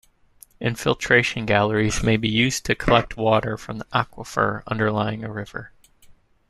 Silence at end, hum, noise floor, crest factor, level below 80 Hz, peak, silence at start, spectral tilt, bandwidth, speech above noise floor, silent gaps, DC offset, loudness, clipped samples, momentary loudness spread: 0.85 s; none; -53 dBFS; 20 dB; -42 dBFS; -2 dBFS; 0.6 s; -5 dB/octave; 13.5 kHz; 31 dB; none; under 0.1%; -22 LUFS; under 0.1%; 12 LU